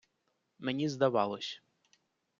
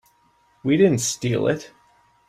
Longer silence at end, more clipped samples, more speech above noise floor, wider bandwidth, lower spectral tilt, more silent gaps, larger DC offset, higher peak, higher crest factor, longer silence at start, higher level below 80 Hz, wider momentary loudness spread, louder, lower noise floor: first, 0.8 s vs 0.6 s; neither; first, 48 dB vs 41 dB; second, 7.6 kHz vs 15.5 kHz; about the same, -5.5 dB/octave vs -5 dB/octave; neither; neither; second, -14 dBFS vs -6 dBFS; about the same, 22 dB vs 18 dB; about the same, 0.6 s vs 0.65 s; second, -80 dBFS vs -58 dBFS; about the same, 12 LU vs 11 LU; second, -33 LUFS vs -21 LUFS; first, -80 dBFS vs -61 dBFS